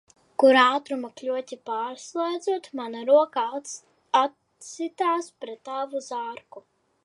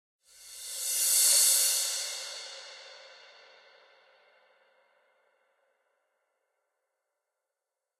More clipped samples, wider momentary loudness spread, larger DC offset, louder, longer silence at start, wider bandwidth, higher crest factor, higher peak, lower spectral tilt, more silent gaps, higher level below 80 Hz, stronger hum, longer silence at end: neither; second, 19 LU vs 25 LU; neither; about the same, -25 LUFS vs -24 LUFS; about the same, 0.4 s vs 0.4 s; second, 11.5 kHz vs 16 kHz; about the same, 22 dB vs 24 dB; first, -4 dBFS vs -10 dBFS; first, -2 dB/octave vs 6 dB/octave; neither; about the same, -82 dBFS vs -82 dBFS; neither; second, 0.45 s vs 4.85 s